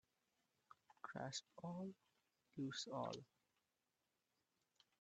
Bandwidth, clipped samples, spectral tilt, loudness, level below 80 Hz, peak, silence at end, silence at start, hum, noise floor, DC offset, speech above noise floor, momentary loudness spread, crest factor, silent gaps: 8.4 kHz; under 0.1%; -4.5 dB/octave; -51 LUFS; under -90 dBFS; -34 dBFS; 1.75 s; 1.05 s; none; under -90 dBFS; under 0.1%; over 40 dB; 9 LU; 22 dB; none